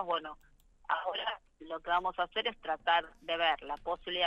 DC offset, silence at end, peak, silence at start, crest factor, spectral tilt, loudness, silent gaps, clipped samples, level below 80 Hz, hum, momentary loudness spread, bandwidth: under 0.1%; 0 s; -16 dBFS; 0 s; 18 dB; -4 dB/octave; -34 LUFS; none; under 0.1%; -62 dBFS; none; 13 LU; 8.4 kHz